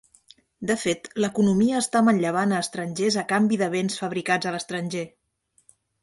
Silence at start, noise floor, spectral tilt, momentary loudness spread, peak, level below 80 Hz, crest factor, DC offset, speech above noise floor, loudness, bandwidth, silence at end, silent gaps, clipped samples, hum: 0.6 s; -67 dBFS; -5 dB/octave; 9 LU; -6 dBFS; -64 dBFS; 18 dB; under 0.1%; 44 dB; -24 LUFS; 11.5 kHz; 0.95 s; none; under 0.1%; none